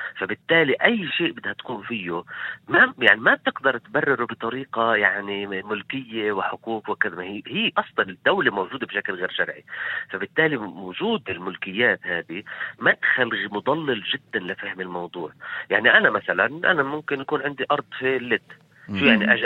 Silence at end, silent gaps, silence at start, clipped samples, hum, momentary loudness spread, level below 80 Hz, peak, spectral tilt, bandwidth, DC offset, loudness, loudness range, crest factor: 0 s; none; 0 s; under 0.1%; none; 13 LU; -68 dBFS; 0 dBFS; -6.5 dB/octave; 16 kHz; under 0.1%; -22 LUFS; 4 LU; 22 dB